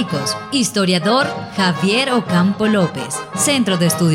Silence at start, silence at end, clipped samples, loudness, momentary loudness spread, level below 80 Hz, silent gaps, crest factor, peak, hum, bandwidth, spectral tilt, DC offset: 0 s; 0 s; under 0.1%; -16 LUFS; 5 LU; -56 dBFS; none; 14 dB; -2 dBFS; none; 16.5 kHz; -4.5 dB/octave; under 0.1%